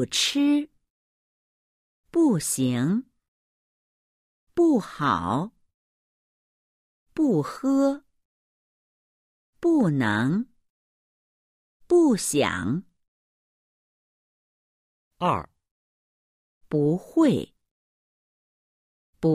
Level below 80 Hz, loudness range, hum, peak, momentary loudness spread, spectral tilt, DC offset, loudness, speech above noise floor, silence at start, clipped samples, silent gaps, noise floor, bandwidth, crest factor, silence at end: -62 dBFS; 6 LU; none; -8 dBFS; 9 LU; -5 dB/octave; under 0.1%; -24 LUFS; over 68 dB; 0 s; under 0.1%; 0.90-2.04 s, 3.28-4.47 s, 5.74-7.06 s, 8.25-9.53 s, 10.70-11.80 s, 13.08-15.11 s, 15.71-16.61 s, 17.71-19.13 s; under -90 dBFS; 15.5 kHz; 18 dB; 0 s